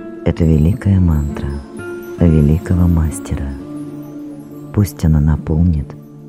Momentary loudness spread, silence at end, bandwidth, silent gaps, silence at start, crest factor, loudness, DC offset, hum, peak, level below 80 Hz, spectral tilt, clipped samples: 16 LU; 0 s; 14.5 kHz; none; 0 s; 16 dB; -15 LUFS; under 0.1%; none; 0 dBFS; -24 dBFS; -8.5 dB/octave; under 0.1%